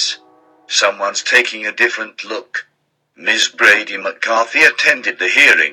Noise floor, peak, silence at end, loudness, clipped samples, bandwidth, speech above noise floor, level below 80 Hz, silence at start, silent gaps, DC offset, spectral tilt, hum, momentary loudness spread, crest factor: -49 dBFS; 0 dBFS; 0 s; -13 LUFS; under 0.1%; 18 kHz; 35 dB; -70 dBFS; 0 s; none; under 0.1%; 0.5 dB/octave; none; 14 LU; 16 dB